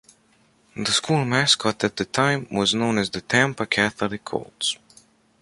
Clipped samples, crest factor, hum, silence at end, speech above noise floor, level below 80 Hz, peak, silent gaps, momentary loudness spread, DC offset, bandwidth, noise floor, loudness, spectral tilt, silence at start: under 0.1%; 22 dB; none; 0.65 s; 38 dB; -58 dBFS; -2 dBFS; none; 10 LU; under 0.1%; 11.5 kHz; -60 dBFS; -22 LUFS; -3.5 dB/octave; 0.75 s